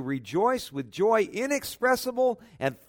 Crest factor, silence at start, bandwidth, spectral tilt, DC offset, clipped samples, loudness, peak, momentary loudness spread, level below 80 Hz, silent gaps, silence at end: 16 dB; 0 s; 19 kHz; -4.5 dB/octave; under 0.1%; under 0.1%; -27 LUFS; -10 dBFS; 7 LU; -64 dBFS; none; 0.15 s